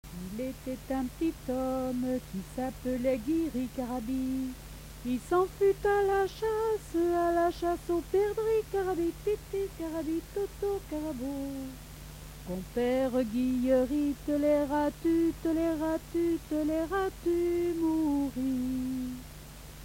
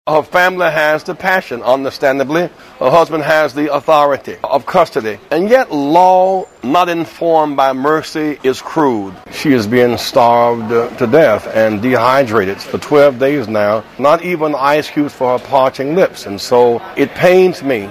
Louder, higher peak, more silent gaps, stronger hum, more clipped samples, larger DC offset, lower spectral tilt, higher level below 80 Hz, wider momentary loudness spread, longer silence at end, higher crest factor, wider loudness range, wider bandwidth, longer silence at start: second, -31 LUFS vs -13 LUFS; second, -16 dBFS vs 0 dBFS; neither; neither; second, under 0.1% vs 0.2%; neither; about the same, -6 dB/octave vs -5.5 dB/octave; about the same, -48 dBFS vs -50 dBFS; first, 12 LU vs 7 LU; about the same, 0 s vs 0 s; about the same, 16 dB vs 12 dB; first, 5 LU vs 2 LU; about the same, 16.5 kHz vs 15.5 kHz; about the same, 0.05 s vs 0.05 s